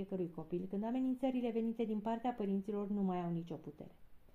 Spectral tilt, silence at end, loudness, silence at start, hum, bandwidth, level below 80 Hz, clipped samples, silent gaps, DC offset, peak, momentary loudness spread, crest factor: -9.5 dB/octave; 0.05 s; -39 LUFS; 0 s; none; 7.4 kHz; -68 dBFS; under 0.1%; none; under 0.1%; -26 dBFS; 12 LU; 14 dB